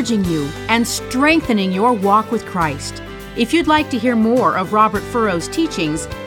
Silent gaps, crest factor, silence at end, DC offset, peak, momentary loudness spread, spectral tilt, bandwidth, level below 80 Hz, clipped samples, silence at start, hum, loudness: none; 16 dB; 0 s; under 0.1%; 0 dBFS; 7 LU; -4.5 dB/octave; 18.5 kHz; -40 dBFS; under 0.1%; 0 s; none; -17 LUFS